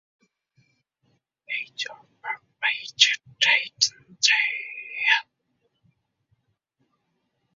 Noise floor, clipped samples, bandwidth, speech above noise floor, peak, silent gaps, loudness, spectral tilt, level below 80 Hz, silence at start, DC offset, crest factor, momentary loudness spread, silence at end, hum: -75 dBFS; under 0.1%; 7.8 kHz; 50 dB; -2 dBFS; none; -22 LUFS; 3 dB/octave; -80 dBFS; 1.5 s; under 0.1%; 26 dB; 15 LU; 2.35 s; none